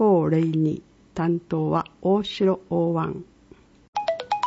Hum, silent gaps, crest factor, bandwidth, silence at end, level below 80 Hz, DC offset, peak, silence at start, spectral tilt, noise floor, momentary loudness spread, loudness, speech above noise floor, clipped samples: none; 3.88-3.93 s; 14 dB; 7.8 kHz; 0 s; -58 dBFS; under 0.1%; -10 dBFS; 0 s; -8 dB/octave; -52 dBFS; 11 LU; -24 LUFS; 29 dB; under 0.1%